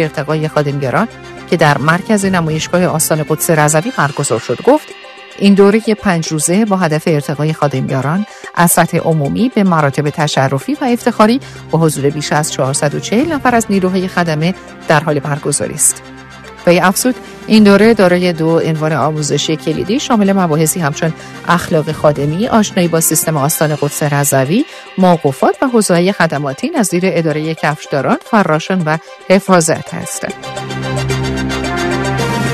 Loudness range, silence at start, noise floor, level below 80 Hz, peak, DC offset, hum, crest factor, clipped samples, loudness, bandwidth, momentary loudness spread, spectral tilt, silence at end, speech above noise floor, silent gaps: 3 LU; 0 s; -33 dBFS; -42 dBFS; 0 dBFS; under 0.1%; none; 12 dB; 0.2%; -13 LUFS; 14 kHz; 8 LU; -5 dB/octave; 0 s; 20 dB; none